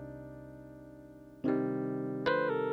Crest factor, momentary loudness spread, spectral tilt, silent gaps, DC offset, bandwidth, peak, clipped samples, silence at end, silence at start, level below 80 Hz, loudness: 18 dB; 21 LU; -8 dB/octave; none; under 0.1%; 6.2 kHz; -18 dBFS; under 0.1%; 0 s; 0 s; -64 dBFS; -33 LUFS